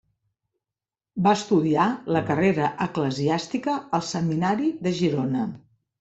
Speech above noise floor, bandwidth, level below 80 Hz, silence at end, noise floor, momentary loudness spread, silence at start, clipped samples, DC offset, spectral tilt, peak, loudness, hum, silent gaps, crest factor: over 67 dB; 8.2 kHz; -60 dBFS; 0.45 s; under -90 dBFS; 6 LU; 1.15 s; under 0.1%; under 0.1%; -6.5 dB/octave; -6 dBFS; -24 LUFS; none; none; 18 dB